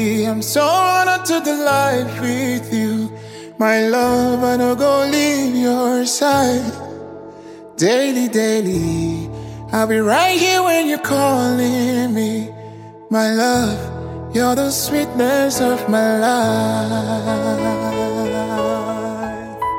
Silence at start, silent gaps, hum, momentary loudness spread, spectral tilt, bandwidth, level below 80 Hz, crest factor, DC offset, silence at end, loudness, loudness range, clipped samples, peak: 0 s; none; none; 12 LU; -4.5 dB/octave; 17 kHz; -48 dBFS; 14 dB; under 0.1%; 0 s; -17 LUFS; 3 LU; under 0.1%; -2 dBFS